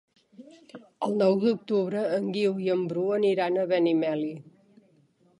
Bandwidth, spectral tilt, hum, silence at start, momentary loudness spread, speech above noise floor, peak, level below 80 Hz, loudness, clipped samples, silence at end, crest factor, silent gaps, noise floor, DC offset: 10.5 kHz; -7.5 dB/octave; none; 0.4 s; 7 LU; 38 dB; -12 dBFS; -78 dBFS; -26 LUFS; under 0.1%; 0.9 s; 16 dB; none; -63 dBFS; under 0.1%